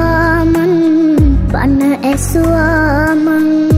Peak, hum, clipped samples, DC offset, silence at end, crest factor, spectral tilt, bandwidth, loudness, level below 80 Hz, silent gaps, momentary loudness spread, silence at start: -2 dBFS; none; under 0.1%; under 0.1%; 0 s; 8 dB; -7 dB/octave; 16 kHz; -11 LUFS; -20 dBFS; none; 3 LU; 0 s